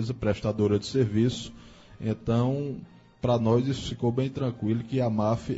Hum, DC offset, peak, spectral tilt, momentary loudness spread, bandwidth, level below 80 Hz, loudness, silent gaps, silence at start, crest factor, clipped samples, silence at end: none; under 0.1%; -12 dBFS; -7.5 dB/octave; 9 LU; 8 kHz; -50 dBFS; -27 LUFS; none; 0 s; 16 dB; under 0.1%; 0 s